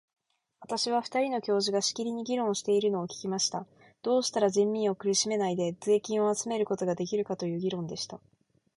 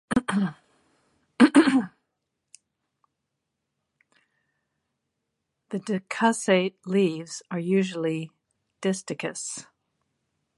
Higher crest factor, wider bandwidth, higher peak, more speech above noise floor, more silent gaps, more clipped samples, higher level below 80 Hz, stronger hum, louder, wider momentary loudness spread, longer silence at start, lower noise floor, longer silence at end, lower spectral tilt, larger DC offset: second, 16 dB vs 24 dB; about the same, 11.5 kHz vs 11.5 kHz; second, -14 dBFS vs -4 dBFS; second, 27 dB vs 55 dB; neither; neither; second, -74 dBFS vs -66 dBFS; neither; second, -29 LUFS vs -25 LUFS; second, 8 LU vs 16 LU; first, 0.6 s vs 0.1 s; second, -57 dBFS vs -82 dBFS; second, 0.6 s vs 0.95 s; about the same, -4 dB/octave vs -5 dB/octave; neither